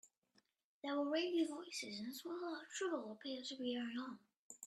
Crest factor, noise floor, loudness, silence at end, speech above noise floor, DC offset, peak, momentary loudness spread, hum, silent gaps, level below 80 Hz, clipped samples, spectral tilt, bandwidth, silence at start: 16 dB; -79 dBFS; -44 LUFS; 0 s; 36 dB; under 0.1%; -28 dBFS; 10 LU; none; 0.18-0.22 s, 0.64-0.82 s, 4.37-4.50 s; under -90 dBFS; under 0.1%; -3 dB/octave; 14 kHz; 0.05 s